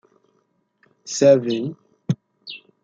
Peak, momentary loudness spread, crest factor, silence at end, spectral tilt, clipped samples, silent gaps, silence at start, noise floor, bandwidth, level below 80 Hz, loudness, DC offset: -2 dBFS; 22 LU; 20 dB; 0.25 s; -5.5 dB/octave; under 0.1%; none; 1.05 s; -67 dBFS; 7.8 kHz; -70 dBFS; -20 LUFS; under 0.1%